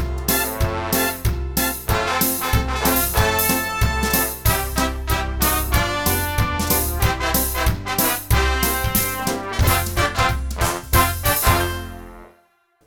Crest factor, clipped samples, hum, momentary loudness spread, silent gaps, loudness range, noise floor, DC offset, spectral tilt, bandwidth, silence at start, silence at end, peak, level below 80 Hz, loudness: 18 dB; under 0.1%; none; 5 LU; none; 1 LU; -60 dBFS; 0.2%; -3.5 dB/octave; 18.5 kHz; 0 s; 0.6 s; -2 dBFS; -26 dBFS; -19 LUFS